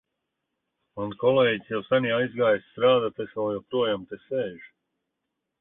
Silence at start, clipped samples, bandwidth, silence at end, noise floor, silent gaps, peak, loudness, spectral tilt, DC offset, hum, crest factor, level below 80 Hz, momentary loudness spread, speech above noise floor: 0.95 s; under 0.1%; 3.9 kHz; 0.95 s; -82 dBFS; none; -10 dBFS; -25 LUFS; -9.5 dB/octave; under 0.1%; none; 18 dB; -66 dBFS; 11 LU; 57 dB